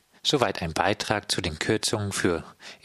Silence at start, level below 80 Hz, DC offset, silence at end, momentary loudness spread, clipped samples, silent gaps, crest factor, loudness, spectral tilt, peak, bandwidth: 0.25 s; -50 dBFS; under 0.1%; 0.1 s; 4 LU; under 0.1%; none; 22 dB; -26 LUFS; -3.5 dB/octave; -4 dBFS; 14.5 kHz